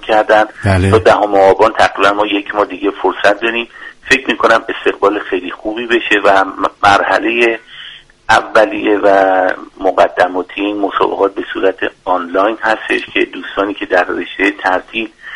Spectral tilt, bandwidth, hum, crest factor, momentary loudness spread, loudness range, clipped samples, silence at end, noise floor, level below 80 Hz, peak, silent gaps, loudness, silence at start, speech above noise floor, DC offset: -5 dB/octave; 11.5 kHz; none; 12 dB; 9 LU; 4 LU; 0.1%; 0 s; -34 dBFS; -44 dBFS; 0 dBFS; none; -12 LUFS; 0 s; 22 dB; under 0.1%